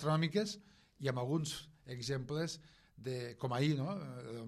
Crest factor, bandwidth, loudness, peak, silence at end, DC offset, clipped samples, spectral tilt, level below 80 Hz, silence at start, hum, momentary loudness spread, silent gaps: 18 dB; 13 kHz; -39 LUFS; -22 dBFS; 0 s; under 0.1%; under 0.1%; -5.5 dB/octave; -70 dBFS; 0 s; none; 12 LU; none